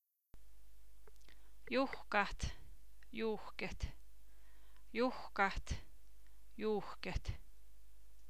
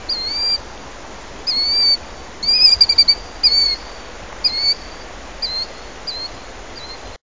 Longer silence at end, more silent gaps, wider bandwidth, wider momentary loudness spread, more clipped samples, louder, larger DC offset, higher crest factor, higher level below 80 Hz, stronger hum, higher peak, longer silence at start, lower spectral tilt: about the same, 0 s vs 0 s; neither; first, 16 kHz vs 7.8 kHz; second, 13 LU vs 25 LU; neither; second, -41 LUFS vs -14 LUFS; about the same, 0.5% vs 1%; first, 26 dB vs 20 dB; second, -52 dBFS vs -40 dBFS; neither; second, -18 dBFS vs 0 dBFS; about the same, 0 s vs 0 s; first, -5 dB/octave vs -1 dB/octave